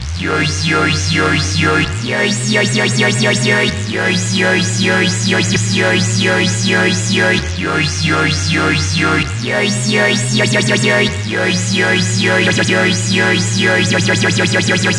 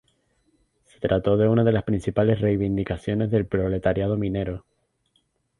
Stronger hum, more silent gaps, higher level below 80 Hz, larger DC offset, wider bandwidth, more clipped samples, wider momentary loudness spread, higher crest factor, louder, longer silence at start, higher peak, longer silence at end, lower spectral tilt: neither; neither; about the same, -40 dBFS vs -44 dBFS; neither; about the same, 11.5 kHz vs 10.5 kHz; neither; second, 3 LU vs 8 LU; about the same, 14 dB vs 18 dB; first, -13 LUFS vs -23 LUFS; second, 0 s vs 1 s; first, 0 dBFS vs -6 dBFS; second, 0 s vs 1 s; second, -4 dB/octave vs -9 dB/octave